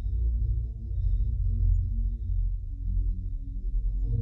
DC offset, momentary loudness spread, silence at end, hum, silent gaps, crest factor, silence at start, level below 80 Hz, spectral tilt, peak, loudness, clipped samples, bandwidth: under 0.1%; 7 LU; 0 s; none; none; 12 dB; 0 s; -28 dBFS; -12 dB/octave; -14 dBFS; -31 LUFS; under 0.1%; 0.7 kHz